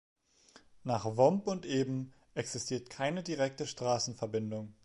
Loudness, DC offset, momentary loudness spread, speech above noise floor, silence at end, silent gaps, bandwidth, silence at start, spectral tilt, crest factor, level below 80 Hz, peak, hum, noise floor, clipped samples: -34 LUFS; under 0.1%; 12 LU; 29 dB; 0.1 s; none; 11.5 kHz; 0.55 s; -5 dB/octave; 22 dB; -70 dBFS; -12 dBFS; none; -63 dBFS; under 0.1%